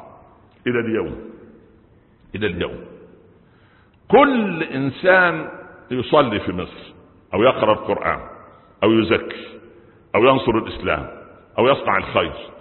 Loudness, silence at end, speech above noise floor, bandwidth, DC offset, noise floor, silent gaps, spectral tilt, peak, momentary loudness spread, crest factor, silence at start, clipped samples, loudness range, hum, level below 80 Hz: -19 LUFS; 0 s; 34 dB; 4.3 kHz; under 0.1%; -53 dBFS; none; -10.5 dB/octave; -2 dBFS; 19 LU; 20 dB; 0 s; under 0.1%; 9 LU; none; -46 dBFS